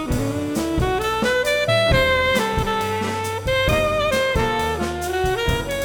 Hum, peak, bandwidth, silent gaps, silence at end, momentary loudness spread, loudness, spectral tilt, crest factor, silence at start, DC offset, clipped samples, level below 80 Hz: none; -6 dBFS; over 20 kHz; none; 0 s; 7 LU; -20 LUFS; -4.5 dB/octave; 16 dB; 0 s; under 0.1%; under 0.1%; -32 dBFS